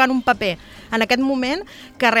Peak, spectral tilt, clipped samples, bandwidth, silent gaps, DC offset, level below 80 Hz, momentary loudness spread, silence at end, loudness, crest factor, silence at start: 0 dBFS; -4 dB/octave; under 0.1%; 15.5 kHz; none; under 0.1%; -50 dBFS; 11 LU; 0 s; -20 LUFS; 18 dB; 0 s